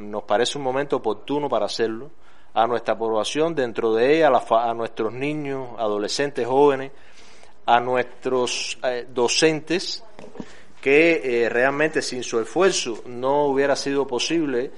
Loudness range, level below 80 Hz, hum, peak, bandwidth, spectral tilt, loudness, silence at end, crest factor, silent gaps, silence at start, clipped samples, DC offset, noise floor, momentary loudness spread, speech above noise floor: 3 LU; -62 dBFS; none; -2 dBFS; 11.5 kHz; -3.5 dB/octave; -22 LUFS; 0.1 s; 20 dB; none; 0 s; under 0.1%; 2%; -50 dBFS; 10 LU; 28 dB